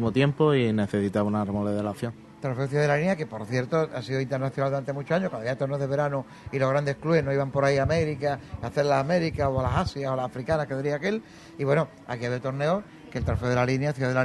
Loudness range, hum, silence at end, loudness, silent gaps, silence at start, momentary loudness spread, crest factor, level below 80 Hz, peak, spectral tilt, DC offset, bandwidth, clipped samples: 3 LU; none; 0 s; -27 LUFS; none; 0 s; 8 LU; 16 dB; -48 dBFS; -8 dBFS; -7 dB/octave; under 0.1%; 12 kHz; under 0.1%